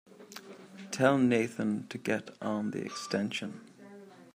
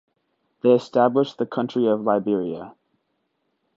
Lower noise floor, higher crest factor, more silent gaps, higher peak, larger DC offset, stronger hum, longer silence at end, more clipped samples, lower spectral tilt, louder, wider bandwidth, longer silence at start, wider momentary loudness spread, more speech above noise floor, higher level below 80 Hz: second, -52 dBFS vs -73 dBFS; about the same, 22 dB vs 18 dB; neither; second, -10 dBFS vs -4 dBFS; neither; neither; second, 0.1 s vs 1.05 s; neither; second, -5.5 dB/octave vs -7.5 dB/octave; second, -31 LUFS vs -21 LUFS; first, 15.5 kHz vs 7.8 kHz; second, 0.2 s vs 0.65 s; first, 24 LU vs 8 LU; second, 21 dB vs 52 dB; second, -76 dBFS vs -70 dBFS